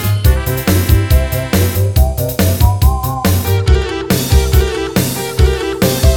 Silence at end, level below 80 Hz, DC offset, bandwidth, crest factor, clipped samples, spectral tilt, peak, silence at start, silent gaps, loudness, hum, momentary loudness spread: 0 s; -16 dBFS; under 0.1%; 18.5 kHz; 12 dB; under 0.1%; -5.5 dB/octave; 0 dBFS; 0 s; none; -14 LUFS; none; 4 LU